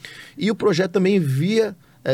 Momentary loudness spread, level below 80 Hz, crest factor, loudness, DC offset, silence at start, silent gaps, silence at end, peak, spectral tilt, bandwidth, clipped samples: 9 LU; -64 dBFS; 12 dB; -20 LUFS; under 0.1%; 0.05 s; none; 0 s; -8 dBFS; -6.5 dB/octave; 15.5 kHz; under 0.1%